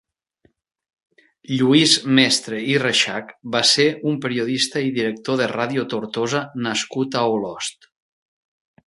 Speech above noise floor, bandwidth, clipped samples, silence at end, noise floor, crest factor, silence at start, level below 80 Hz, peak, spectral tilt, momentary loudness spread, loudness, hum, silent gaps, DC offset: 43 dB; 11.5 kHz; under 0.1%; 1.15 s; -63 dBFS; 22 dB; 1.5 s; -66 dBFS; 0 dBFS; -3.5 dB/octave; 10 LU; -19 LUFS; none; none; under 0.1%